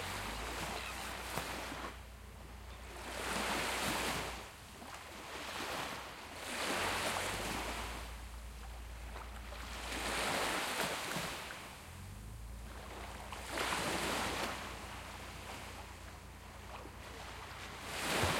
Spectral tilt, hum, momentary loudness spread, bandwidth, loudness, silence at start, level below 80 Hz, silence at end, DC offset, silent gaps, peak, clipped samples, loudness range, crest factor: -2.5 dB/octave; none; 15 LU; 16.5 kHz; -41 LUFS; 0 s; -52 dBFS; 0 s; under 0.1%; none; -20 dBFS; under 0.1%; 4 LU; 22 dB